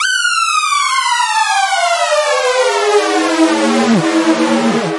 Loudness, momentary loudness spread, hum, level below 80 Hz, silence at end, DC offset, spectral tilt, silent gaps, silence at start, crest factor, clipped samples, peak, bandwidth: -12 LUFS; 1 LU; none; -62 dBFS; 0 s; under 0.1%; -3 dB/octave; none; 0 s; 12 dB; under 0.1%; 0 dBFS; 11.5 kHz